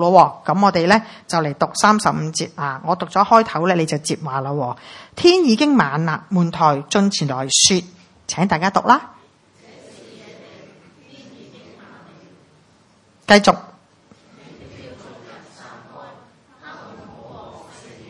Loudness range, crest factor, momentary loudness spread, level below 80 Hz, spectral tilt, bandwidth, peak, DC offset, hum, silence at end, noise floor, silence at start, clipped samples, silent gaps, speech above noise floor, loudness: 6 LU; 20 dB; 22 LU; -58 dBFS; -4 dB/octave; 11.5 kHz; 0 dBFS; under 0.1%; none; 0.5 s; -54 dBFS; 0 s; under 0.1%; none; 38 dB; -17 LUFS